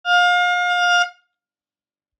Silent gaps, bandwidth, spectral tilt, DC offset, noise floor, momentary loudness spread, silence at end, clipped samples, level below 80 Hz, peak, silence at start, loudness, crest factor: none; 9 kHz; 6.5 dB/octave; under 0.1%; under -90 dBFS; 4 LU; 1.1 s; under 0.1%; under -90 dBFS; -6 dBFS; 0.05 s; -17 LUFS; 14 dB